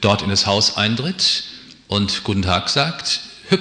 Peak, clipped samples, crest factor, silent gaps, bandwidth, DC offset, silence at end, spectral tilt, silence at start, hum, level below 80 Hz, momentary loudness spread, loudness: -2 dBFS; under 0.1%; 18 dB; none; 10.5 kHz; under 0.1%; 0 s; -3.5 dB/octave; 0 s; none; -48 dBFS; 7 LU; -18 LUFS